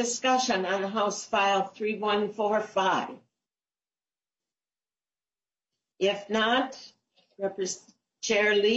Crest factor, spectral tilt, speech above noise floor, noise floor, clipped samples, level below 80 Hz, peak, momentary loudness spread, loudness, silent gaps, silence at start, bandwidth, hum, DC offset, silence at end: 18 dB; -2.5 dB/octave; over 63 dB; under -90 dBFS; under 0.1%; -72 dBFS; -12 dBFS; 11 LU; -27 LUFS; none; 0 s; 8.2 kHz; none; under 0.1%; 0 s